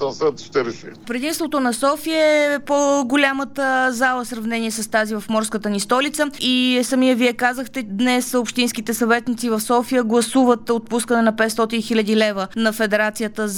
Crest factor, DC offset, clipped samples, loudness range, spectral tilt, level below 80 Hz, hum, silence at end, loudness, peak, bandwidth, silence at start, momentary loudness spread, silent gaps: 16 dB; under 0.1%; under 0.1%; 1 LU; -3.5 dB/octave; -56 dBFS; none; 0 s; -19 LUFS; -2 dBFS; 19 kHz; 0 s; 7 LU; none